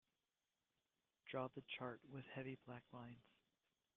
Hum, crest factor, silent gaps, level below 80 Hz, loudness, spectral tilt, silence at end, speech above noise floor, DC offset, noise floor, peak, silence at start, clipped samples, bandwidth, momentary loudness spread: none; 24 dB; none; -86 dBFS; -53 LUFS; -4.5 dB/octave; 0.75 s; over 37 dB; under 0.1%; under -90 dBFS; -32 dBFS; 1.25 s; under 0.1%; 6.6 kHz; 11 LU